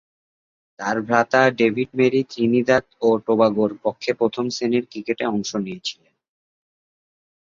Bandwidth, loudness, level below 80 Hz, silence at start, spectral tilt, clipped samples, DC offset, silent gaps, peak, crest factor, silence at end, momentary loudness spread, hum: 7.6 kHz; -21 LUFS; -62 dBFS; 0.8 s; -5.5 dB/octave; under 0.1%; under 0.1%; none; 0 dBFS; 20 dB; 1.65 s; 9 LU; none